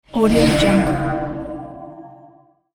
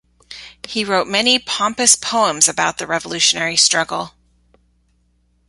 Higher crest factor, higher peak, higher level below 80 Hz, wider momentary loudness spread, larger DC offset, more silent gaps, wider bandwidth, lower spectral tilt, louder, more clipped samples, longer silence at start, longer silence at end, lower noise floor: about the same, 16 dB vs 20 dB; about the same, -2 dBFS vs 0 dBFS; first, -34 dBFS vs -56 dBFS; first, 21 LU vs 14 LU; neither; neither; first, 19.5 kHz vs 16 kHz; first, -6 dB/octave vs -0.5 dB/octave; about the same, -17 LUFS vs -15 LUFS; neither; second, 0.15 s vs 0.3 s; second, 0.65 s vs 1.4 s; second, -50 dBFS vs -61 dBFS